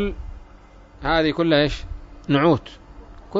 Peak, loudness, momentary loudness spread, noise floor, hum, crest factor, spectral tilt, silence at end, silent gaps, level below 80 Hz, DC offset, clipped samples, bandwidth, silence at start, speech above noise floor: -4 dBFS; -20 LUFS; 21 LU; -46 dBFS; none; 18 dB; -7 dB/octave; 0 s; none; -36 dBFS; under 0.1%; under 0.1%; 7.8 kHz; 0 s; 26 dB